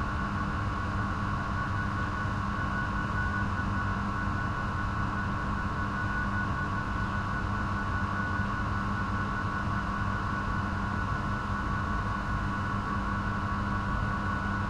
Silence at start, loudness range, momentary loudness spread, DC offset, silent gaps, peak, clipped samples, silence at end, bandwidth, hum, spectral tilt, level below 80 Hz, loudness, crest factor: 0 s; 0 LU; 1 LU; under 0.1%; none; -18 dBFS; under 0.1%; 0 s; 10.5 kHz; none; -7 dB/octave; -38 dBFS; -31 LUFS; 12 dB